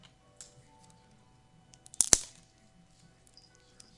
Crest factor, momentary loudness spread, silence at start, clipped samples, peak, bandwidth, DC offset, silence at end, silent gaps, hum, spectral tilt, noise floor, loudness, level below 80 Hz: 38 dB; 28 LU; 0.4 s; under 0.1%; 0 dBFS; 12 kHz; under 0.1%; 1.7 s; none; none; 0 dB/octave; -62 dBFS; -25 LUFS; -56 dBFS